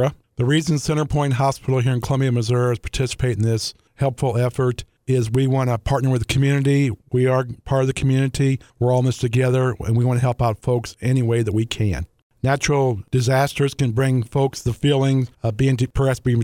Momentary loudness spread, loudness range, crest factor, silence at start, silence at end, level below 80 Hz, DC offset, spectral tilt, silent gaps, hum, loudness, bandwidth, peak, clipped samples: 5 LU; 2 LU; 14 dB; 0 s; 0 s; -40 dBFS; under 0.1%; -6.5 dB/octave; 12.22-12.30 s; none; -20 LUFS; 14.5 kHz; -4 dBFS; under 0.1%